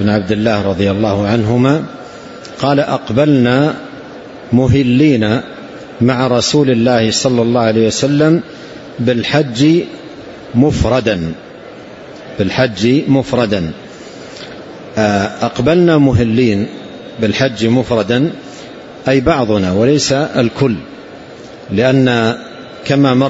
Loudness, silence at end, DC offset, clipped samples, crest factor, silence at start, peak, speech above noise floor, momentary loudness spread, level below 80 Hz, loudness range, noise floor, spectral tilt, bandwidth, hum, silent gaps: -13 LUFS; 0 s; under 0.1%; under 0.1%; 14 dB; 0 s; 0 dBFS; 21 dB; 20 LU; -38 dBFS; 3 LU; -32 dBFS; -6 dB/octave; 8 kHz; none; none